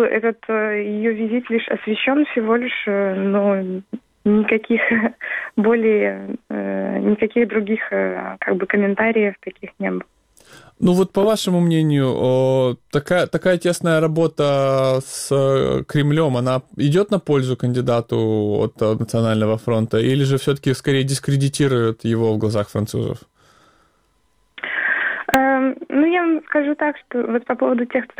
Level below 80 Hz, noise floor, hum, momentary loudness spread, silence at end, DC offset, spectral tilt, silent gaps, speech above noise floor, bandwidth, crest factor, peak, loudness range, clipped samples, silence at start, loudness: -54 dBFS; -63 dBFS; none; 7 LU; 0.15 s; under 0.1%; -6.5 dB/octave; none; 44 dB; 19.5 kHz; 18 dB; 0 dBFS; 3 LU; under 0.1%; 0 s; -19 LUFS